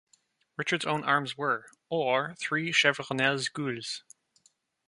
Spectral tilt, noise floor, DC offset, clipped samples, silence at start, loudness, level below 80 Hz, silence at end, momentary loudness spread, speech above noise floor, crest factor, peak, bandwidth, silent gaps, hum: -3.5 dB/octave; -69 dBFS; under 0.1%; under 0.1%; 0.6 s; -28 LUFS; -76 dBFS; 0.9 s; 11 LU; 40 dB; 24 dB; -8 dBFS; 11.5 kHz; none; none